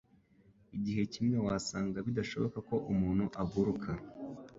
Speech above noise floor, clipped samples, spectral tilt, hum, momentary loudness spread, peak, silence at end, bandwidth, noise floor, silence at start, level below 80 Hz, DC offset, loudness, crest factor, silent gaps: 31 dB; under 0.1%; -6.5 dB/octave; none; 9 LU; -18 dBFS; 0 s; 8 kHz; -65 dBFS; 0.7 s; -56 dBFS; under 0.1%; -35 LUFS; 16 dB; none